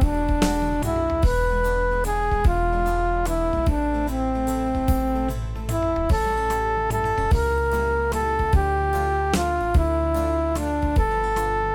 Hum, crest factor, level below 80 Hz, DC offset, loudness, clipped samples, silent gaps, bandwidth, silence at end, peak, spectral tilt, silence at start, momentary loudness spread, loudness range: none; 14 dB; -26 dBFS; 0.6%; -23 LUFS; under 0.1%; none; 18 kHz; 0 s; -6 dBFS; -6.5 dB/octave; 0 s; 3 LU; 2 LU